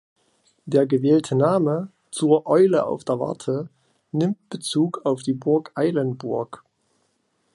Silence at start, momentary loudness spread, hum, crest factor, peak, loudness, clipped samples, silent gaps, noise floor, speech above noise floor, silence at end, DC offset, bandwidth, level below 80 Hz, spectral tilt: 0.65 s; 11 LU; none; 18 dB; -4 dBFS; -22 LUFS; under 0.1%; none; -69 dBFS; 48 dB; 1 s; under 0.1%; 11.5 kHz; -70 dBFS; -6.5 dB/octave